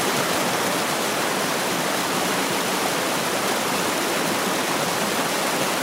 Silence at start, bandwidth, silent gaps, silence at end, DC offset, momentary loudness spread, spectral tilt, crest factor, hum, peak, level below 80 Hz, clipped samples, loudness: 0 s; 16.5 kHz; none; 0 s; under 0.1%; 1 LU; -2.5 dB/octave; 14 dB; none; -8 dBFS; -62 dBFS; under 0.1%; -22 LUFS